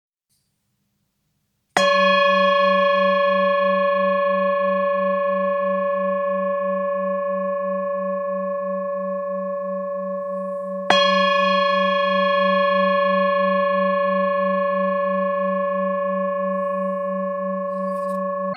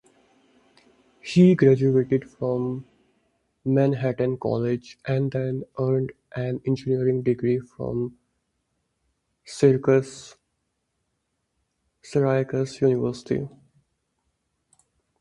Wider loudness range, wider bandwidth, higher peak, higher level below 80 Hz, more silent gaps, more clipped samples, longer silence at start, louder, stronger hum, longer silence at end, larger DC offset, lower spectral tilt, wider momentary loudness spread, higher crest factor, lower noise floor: about the same, 6 LU vs 5 LU; second, 9.6 kHz vs 11 kHz; first, 0 dBFS vs -4 dBFS; second, -80 dBFS vs -60 dBFS; neither; neither; first, 1.75 s vs 1.25 s; first, -20 LUFS vs -23 LUFS; neither; second, 0 s vs 1.75 s; neither; second, -5 dB/octave vs -8 dB/octave; second, 9 LU vs 13 LU; about the same, 20 dB vs 20 dB; second, -71 dBFS vs -76 dBFS